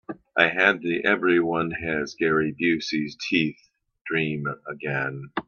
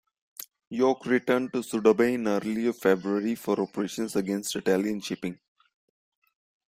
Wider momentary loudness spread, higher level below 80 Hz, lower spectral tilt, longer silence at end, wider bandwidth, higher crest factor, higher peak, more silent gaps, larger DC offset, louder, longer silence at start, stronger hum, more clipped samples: second, 9 LU vs 13 LU; first, -62 dBFS vs -68 dBFS; about the same, -5.5 dB/octave vs -5 dB/octave; second, 0.05 s vs 1.4 s; second, 7 kHz vs 16 kHz; about the same, 24 dB vs 20 dB; first, 0 dBFS vs -8 dBFS; about the same, 4.01-4.05 s vs 0.67-0.71 s; neither; first, -24 LUFS vs -27 LUFS; second, 0.1 s vs 0.4 s; neither; neither